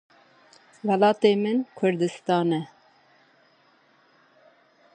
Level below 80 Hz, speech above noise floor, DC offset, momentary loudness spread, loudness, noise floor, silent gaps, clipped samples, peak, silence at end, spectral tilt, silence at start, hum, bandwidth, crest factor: -78 dBFS; 38 dB; under 0.1%; 11 LU; -24 LUFS; -61 dBFS; none; under 0.1%; -6 dBFS; 2.3 s; -6.5 dB/octave; 0.85 s; none; 9.2 kHz; 20 dB